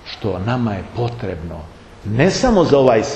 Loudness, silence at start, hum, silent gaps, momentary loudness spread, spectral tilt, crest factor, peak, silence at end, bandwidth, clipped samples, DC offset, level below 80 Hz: -17 LUFS; 0 s; none; none; 18 LU; -6 dB/octave; 18 dB; 0 dBFS; 0 s; 8.8 kHz; under 0.1%; under 0.1%; -36 dBFS